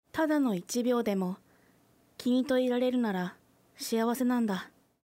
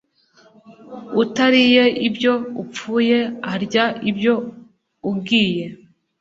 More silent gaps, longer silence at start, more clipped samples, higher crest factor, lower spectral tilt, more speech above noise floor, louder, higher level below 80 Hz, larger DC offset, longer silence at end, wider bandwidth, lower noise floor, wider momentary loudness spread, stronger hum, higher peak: neither; second, 0.15 s vs 0.7 s; neither; second, 12 dB vs 18 dB; about the same, -5.5 dB/octave vs -5 dB/octave; about the same, 36 dB vs 36 dB; second, -30 LUFS vs -18 LUFS; second, -72 dBFS vs -62 dBFS; neither; about the same, 0.4 s vs 0.45 s; first, 16 kHz vs 7.8 kHz; first, -65 dBFS vs -54 dBFS; second, 10 LU vs 16 LU; neither; second, -18 dBFS vs -2 dBFS